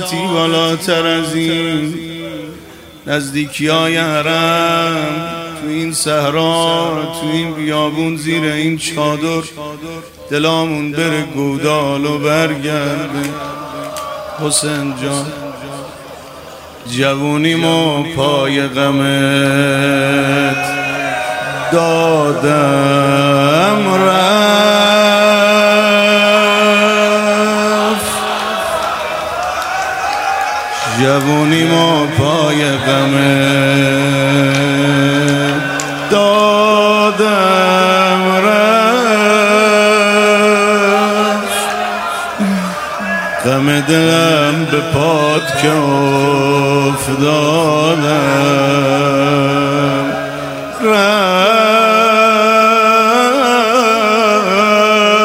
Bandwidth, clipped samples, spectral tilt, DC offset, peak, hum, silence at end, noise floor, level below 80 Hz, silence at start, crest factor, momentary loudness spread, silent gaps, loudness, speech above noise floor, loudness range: 16 kHz; under 0.1%; -4.5 dB/octave; under 0.1%; 0 dBFS; none; 0 s; -35 dBFS; -48 dBFS; 0 s; 12 dB; 10 LU; none; -12 LUFS; 23 dB; 7 LU